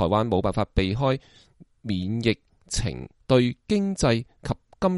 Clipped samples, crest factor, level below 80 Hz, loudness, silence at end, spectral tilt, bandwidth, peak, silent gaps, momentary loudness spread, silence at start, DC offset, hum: under 0.1%; 20 dB; -38 dBFS; -25 LUFS; 0 s; -6 dB/octave; 11.5 kHz; -6 dBFS; none; 11 LU; 0 s; under 0.1%; none